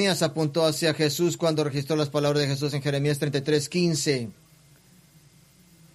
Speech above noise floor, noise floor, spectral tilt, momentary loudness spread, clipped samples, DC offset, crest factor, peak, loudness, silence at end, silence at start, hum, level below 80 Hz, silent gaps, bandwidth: 31 dB; -56 dBFS; -5 dB/octave; 3 LU; under 0.1%; under 0.1%; 18 dB; -8 dBFS; -25 LUFS; 1.6 s; 0 s; none; -62 dBFS; none; 14 kHz